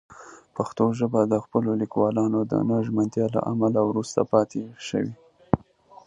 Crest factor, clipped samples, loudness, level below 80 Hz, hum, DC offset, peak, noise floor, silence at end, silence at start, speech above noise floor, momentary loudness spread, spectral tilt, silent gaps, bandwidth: 22 dB; under 0.1%; -25 LUFS; -56 dBFS; none; under 0.1%; -2 dBFS; -51 dBFS; 0.5 s; 0.1 s; 28 dB; 8 LU; -7.5 dB/octave; none; 10 kHz